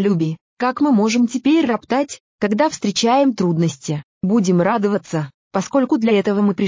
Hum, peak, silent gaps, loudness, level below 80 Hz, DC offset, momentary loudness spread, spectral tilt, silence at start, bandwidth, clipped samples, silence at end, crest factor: none; -4 dBFS; 0.41-0.57 s, 2.20-2.39 s, 4.04-4.21 s, 5.34-5.51 s; -18 LUFS; -60 dBFS; under 0.1%; 9 LU; -6 dB/octave; 0 s; 7.6 kHz; under 0.1%; 0 s; 14 dB